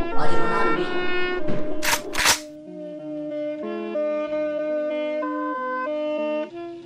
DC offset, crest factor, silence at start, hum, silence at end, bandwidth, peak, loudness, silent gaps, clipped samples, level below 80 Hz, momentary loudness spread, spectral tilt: under 0.1%; 16 dB; 0 s; none; 0 s; 16 kHz; -6 dBFS; -25 LUFS; none; under 0.1%; -42 dBFS; 12 LU; -3 dB/octave